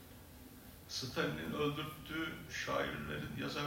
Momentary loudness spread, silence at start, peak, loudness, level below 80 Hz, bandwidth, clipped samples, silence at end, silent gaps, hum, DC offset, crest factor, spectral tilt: 17 LU; 0 s; -22 dBFS; -40 LUFS; -62 dBFS; 16 kHz; under 0.1%; 0 s; none; none; under 0.1%; 20 dB; -4.5 dB/octave